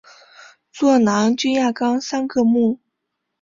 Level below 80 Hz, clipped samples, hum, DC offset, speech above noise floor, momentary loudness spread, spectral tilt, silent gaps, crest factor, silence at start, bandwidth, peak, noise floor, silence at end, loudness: -62 dBFS; under 0.1%; none; under 0.1%; 60 dB; 6 LU; -5 dB/octave; none; 14 dB; 0.75 s; 7.6 kHz; -4 dBFS; -77 dBFS; 0.65 s; -18 LUFS